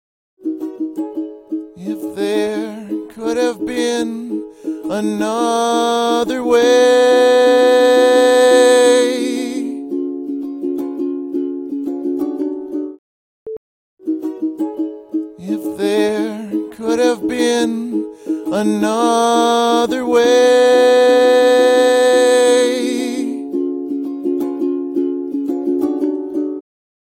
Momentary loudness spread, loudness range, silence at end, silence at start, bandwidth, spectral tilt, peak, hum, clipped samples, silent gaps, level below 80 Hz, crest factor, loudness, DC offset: 14 LU; 12 LU; 0.5 s; 0.4 s; 16 kHz; -3.5 dB/octave; 0 dBFS; none; under 0.1%; 12.99-13.46 s, 13.57-13.97 s; -60 dBFS; 16 dB; -15 LUFS; under 0.1%